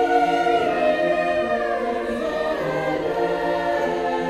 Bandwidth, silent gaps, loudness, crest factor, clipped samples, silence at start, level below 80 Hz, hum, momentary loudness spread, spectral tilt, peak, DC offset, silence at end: 13.5 kHz; none; -22 LUFS; 14 dB; under 0.1%; 0 s; -50 dBFS; none; 5 LU; -5.5 dB/octave; -6 dBFS; under 0.1%; 0 s